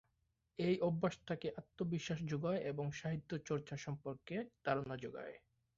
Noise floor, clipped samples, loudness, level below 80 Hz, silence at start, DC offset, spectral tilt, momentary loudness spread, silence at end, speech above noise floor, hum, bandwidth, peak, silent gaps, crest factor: -83 dBFS; under 0.1%; -42 LUFS; -72 dBFS; 0.6 s; under 0.1%; -6 dB/octave; 10 LU; 0.4 s; 42 dB; none; 7.6 kHz; -22 dBFS; none; 20 dB